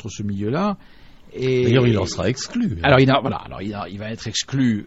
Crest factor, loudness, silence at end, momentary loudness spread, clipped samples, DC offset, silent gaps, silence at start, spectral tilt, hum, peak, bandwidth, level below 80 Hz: 18 dB; -20 LUFS; 0 s; 14 LU; under 0.1%; 0.4%; none; 0.05 s; -5.5 dB/octave; none; -2 dBFS; 8.2 kHz; -44 dBFS